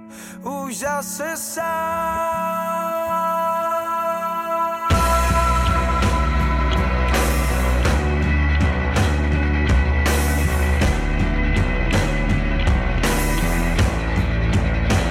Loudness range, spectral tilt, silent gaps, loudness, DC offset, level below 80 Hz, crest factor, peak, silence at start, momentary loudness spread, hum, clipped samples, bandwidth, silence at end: 3 LU; -5.5 dB/octave; none; -20 LUFS; under 0.1%; -22 dBFS; 10 dB; -8 dBFS; 0 s; 5 LU; none; under 0.1%; 16.5 kHz; 0 s